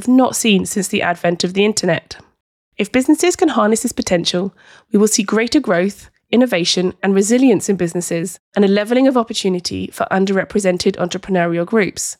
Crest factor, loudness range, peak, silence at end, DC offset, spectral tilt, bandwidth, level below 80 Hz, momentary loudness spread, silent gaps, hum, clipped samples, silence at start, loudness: 12 dB; 2 LU; -4 dBFS; 0.05 s; under 0.1%; -4.5 dB/octave; 16 kHz; -52 dBFS; 8 LU; 2.40-2.72 s, 8.39-8.52 s; none; under 0.1%; 0 s; -16 LUFS